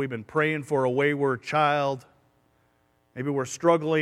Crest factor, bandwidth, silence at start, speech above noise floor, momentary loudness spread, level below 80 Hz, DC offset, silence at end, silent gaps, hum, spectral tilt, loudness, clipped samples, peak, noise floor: 20 dB; 13.5 kHz; 0 s; 42 dB; 8 LU; -70 dBFS; under 0.1%; 0 s; none; none; -5.5 dB/octave; -25 LUFS; under 0.1%; -6 dBFS; -67 dBFS